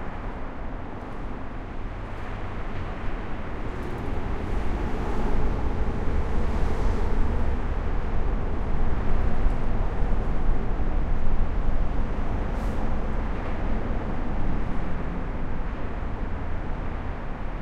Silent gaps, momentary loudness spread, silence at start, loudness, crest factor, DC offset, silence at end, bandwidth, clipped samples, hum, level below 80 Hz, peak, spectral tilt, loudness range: none; 8 LU; 0 s; -31 LUFS; 14 dB; under 0.1%; 0 s; 4.7 kHz; under 0.1%; none; -26 dBFS; -8 dBFS; -8 dB/octave; 5 LU